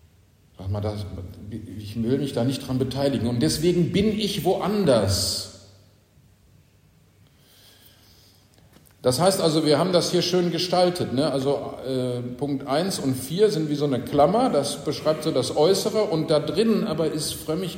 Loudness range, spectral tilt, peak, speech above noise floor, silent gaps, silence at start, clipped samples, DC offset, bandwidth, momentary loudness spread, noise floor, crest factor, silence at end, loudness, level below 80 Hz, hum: 6 LU; -5 dB/octave; -6 dBFS; 34 dB; none; 0.6 s; under 0.1%; under 0.1%; 16 kHz; 9 LU; -57 dBFS; 18 dB; 0 s; -23 LUFS; -52 dBFS; none